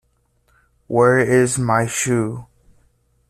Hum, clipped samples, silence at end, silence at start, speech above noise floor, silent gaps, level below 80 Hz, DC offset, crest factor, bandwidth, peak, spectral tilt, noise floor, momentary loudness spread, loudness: none; under 0.1%; 0.85 s; 0.9 s; 46 dB; none; -52 dBFS; under 0.1%; 16 dB; 14 kHz; -4 dBFS; -5.5 dB/octave; -63 dBFS; 10 LU; -17 LUFS